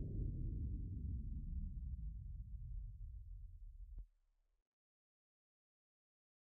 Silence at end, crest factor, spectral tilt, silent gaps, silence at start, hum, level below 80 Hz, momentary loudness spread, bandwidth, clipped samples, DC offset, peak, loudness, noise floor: 2.45 s; 16 dB; -14 dB/octave; none; 0 s; none; -50 dBFS; 13 LU; 0.7 kHz; under 0.1%; under 0.1%; -34 dBFS; -50 LUFS; -79 dBFS